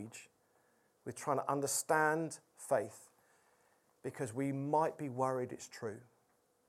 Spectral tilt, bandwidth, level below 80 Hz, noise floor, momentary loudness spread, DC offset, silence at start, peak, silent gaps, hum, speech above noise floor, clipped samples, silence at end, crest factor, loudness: -4.5 dB/octave; 16 kHz; -86 dBFS; -75 dBFS; 17 LU; under 0.1%; 0 s; -18 dBFS; none; none; 38 dB; under 0.1%; 0.65 s; 22 dB; -37 LUFS